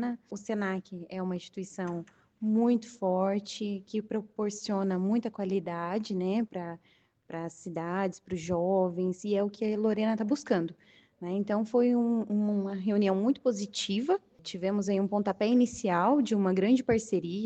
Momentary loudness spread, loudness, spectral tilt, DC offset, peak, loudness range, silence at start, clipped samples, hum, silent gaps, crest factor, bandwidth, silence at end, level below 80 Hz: 12 LU; -30 LUFS; -6 dB/octave; under 0.1%; -12 dBFS; 4 LU; 0 s; under 0.1%; none; none; 16 dB; 8.6 kHz; 0 s; -68 dBFS